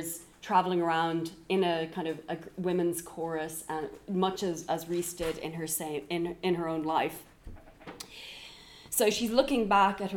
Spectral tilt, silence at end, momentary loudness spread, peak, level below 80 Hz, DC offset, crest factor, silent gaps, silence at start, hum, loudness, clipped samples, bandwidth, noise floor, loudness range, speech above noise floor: -4 dB/octave; 0 s; 17 LU; -10 dBFS; -58 dBFS; under 0.1%; 20 dB; none; 0 s; none; -31 LUFS; under 0.1%; 18.5 kHz; -51 dBFS; 4 LU; 21 dB